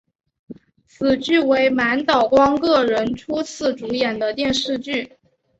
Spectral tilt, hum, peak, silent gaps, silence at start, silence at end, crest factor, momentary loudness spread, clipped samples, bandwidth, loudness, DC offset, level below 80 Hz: -4 dB/octave; none; -4 dBFS; none; 0.5 s; 0.55 s; 16 dB; 9 LU; under 0.1%; 8.2 kHz; -19 LUFS; under 0.1%; -52 dBFS